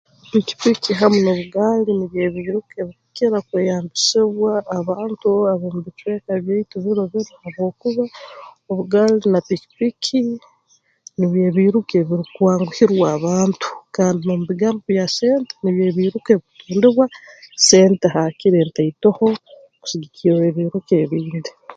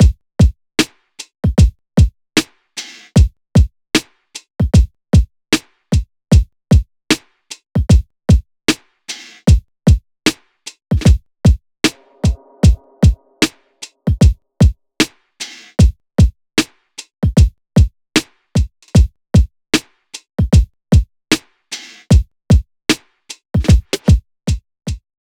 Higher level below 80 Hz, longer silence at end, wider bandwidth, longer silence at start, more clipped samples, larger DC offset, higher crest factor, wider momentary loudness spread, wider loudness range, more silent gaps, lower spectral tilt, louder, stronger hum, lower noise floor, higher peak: second, -60 dBFS vs -18 dBFS; second, 0.05 s vs 0.3 s; second, 9.2 kHz vs 15.5 kHz; first, 0.35 s vs 0 s; neither; neither; about the same, 18 dB vs 14 dB; second, 11 LU vs 15 LU; first, 5 LU vs 1 LU; neither; about the same, -5 dB/octave vs -5.5 dB/octave; about the same, -18 LUFS vs -16 LUFS; neither; first, -60 dBFS vs -39 dBFS; about the same, 0 dBFS vs -2 dBFS